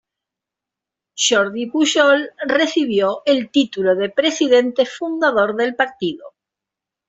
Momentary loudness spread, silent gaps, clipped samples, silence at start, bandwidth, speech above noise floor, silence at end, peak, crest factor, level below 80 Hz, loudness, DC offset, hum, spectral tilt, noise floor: 6 LU; none; under 0.1%; 1.15 s; 8.2 kHz; 68 dB; 0.8 s; -2 dBFS; 16 dB; -64 dBFS; -17 LUFS; under 0.1%; none; -2.5 dB/octave; -85 dBFS